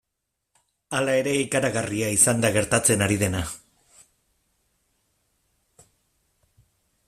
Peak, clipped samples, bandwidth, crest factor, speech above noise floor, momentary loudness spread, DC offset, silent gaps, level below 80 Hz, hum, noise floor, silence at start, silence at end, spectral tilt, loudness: -2 dBFS; under 0.1%; 15.5 kHz; 24 dB; 58 dB; 12 LU; under 0.1%; none; -54 dBFS; none; -81 dBFS; 0.9 s; 3.5 s; -3.5 dB/octave; -22 LUFS